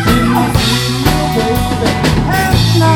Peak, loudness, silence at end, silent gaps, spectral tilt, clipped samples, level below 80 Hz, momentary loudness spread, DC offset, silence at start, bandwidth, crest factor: 0 dBFS; -12 LUFS; 0 s; none; -5 dB/octave; under 0.1%; -22 dBFS; 3 LU; under 0.1%; 0 s; 19 kHz; 12 dB